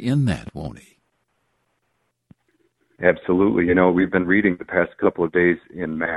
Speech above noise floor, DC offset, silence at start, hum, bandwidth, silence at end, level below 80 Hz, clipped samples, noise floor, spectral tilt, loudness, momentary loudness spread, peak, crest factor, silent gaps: 52 dB; under 0.1%; 0 s; none; 11.5 kHz; 0 s; -48 dBFS; under 0.1%; -72 dBFS; -8 dB/octave; -20 LUFS; 12 LU; -2 dBFS; 20 dB; none